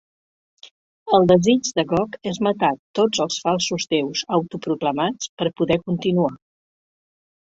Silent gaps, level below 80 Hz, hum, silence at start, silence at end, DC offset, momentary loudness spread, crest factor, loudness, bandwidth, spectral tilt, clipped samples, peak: 0.71-1.06 s, 2.79-2.94 s, 5.29-5.37 s; -56 dBFS; none; 0.65 s; 1.05 s; under 0.1%; 9 LU; 20 dB; -21 LUFS; 8 kHz; -5 dB/octave; under 0.1%; -2 dBFS